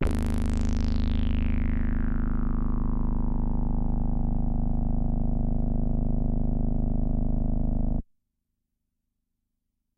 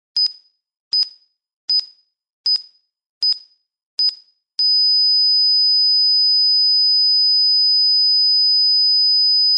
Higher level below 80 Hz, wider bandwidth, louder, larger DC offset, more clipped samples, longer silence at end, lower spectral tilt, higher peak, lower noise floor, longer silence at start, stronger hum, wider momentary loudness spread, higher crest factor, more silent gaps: first, -26 dBFS vs -80 dBFS; second, 6 kHz vs 9 kHz; second, -29 LUFS vs -13 LUFS; neither; neither; first, 1.95 s vs 0 s; first, -8.5 dB/octave vs 3.5 dB/octave; second, -14 dBFS vs -10 dBFS; first, -80 dBFS vs -50 dBFS; second, 0 s vs 0.15 s; neither; second, 2 LU vs 8 LU; first, 12 dB vs 6 dB; second, none vs 0.80-0.91 s, 1.56-1.68 s, 2.33-2.44 s, 3.09-3.21 s, 3.86-3.98 s